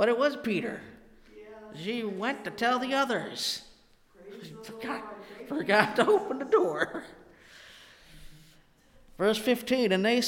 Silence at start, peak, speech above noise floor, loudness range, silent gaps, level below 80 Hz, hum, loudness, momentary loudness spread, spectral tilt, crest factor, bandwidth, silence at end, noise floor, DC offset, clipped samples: 0 s; -6 dBFS; 31 dB; 4 LU; none; -62 dBFS; none; -28 LUFS; 22 LU; -4 dB/octave; 24 dB; 17 kHz; 0 s; -59 dBFS; under 0.1%; under 0.1%